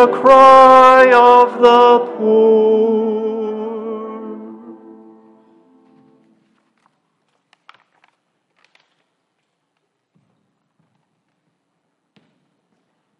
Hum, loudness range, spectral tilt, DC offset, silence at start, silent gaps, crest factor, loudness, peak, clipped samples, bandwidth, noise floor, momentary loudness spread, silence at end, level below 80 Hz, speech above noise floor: none; 24 LU; -5 dB/octave; under 0.1%; 0 s; none; 14 dB; -10 LUFS; 0 dBFS; under 0.1%; 10.5 kHz; -71 dBFS; 22 LU; 8.45 s; -58 dBFS; 62 dB